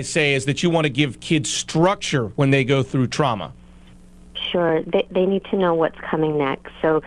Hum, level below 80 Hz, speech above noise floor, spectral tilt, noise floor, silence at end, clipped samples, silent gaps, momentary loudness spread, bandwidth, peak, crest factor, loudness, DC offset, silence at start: none; -50 dBFS; 25 dB; -5 dB/octave; -45 dBFS; 0 s; under 0.1%; none; 5 LU; 11.5 kHz; -4 dBFS; 16 dB; -20 LUFS; under 0.1%; 0 s